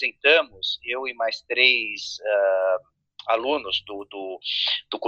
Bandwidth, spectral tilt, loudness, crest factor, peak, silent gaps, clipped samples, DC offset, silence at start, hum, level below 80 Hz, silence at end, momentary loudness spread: 7.8 kHz; -1 dB/octave; -22 LUFS; 22 dB; -4 dBFS; none; under 0.1%; under 0.1%; 0 s; none; -68 dBFS; 0 s; 13 LU